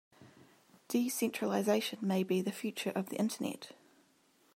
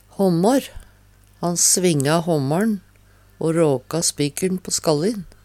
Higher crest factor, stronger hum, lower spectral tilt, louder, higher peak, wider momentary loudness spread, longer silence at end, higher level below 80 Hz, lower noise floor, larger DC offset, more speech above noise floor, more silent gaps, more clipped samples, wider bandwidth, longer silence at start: about the same, 18 dB vs 18 dB; second, none vs 50 Hz at -50 dBFS; about the same, -5 dB/octave vs -4.5 dB/octave; second, -35 LUFS vs -20 LUFS; second, -18 dBFS vs -4 dBFS; about the same, 8 LU vs 9 LU; first, 0.85 s vs 0.2 s; second, -86 dBFS vs -50 dBFS; first, -69 dBFS vs -52 dBFS; neither; about the same, 35 dB vs 33 dB; neither; neither; about the same, 16 kHz vs 16 kHz; about the same, 0.2 s vs 0.2 s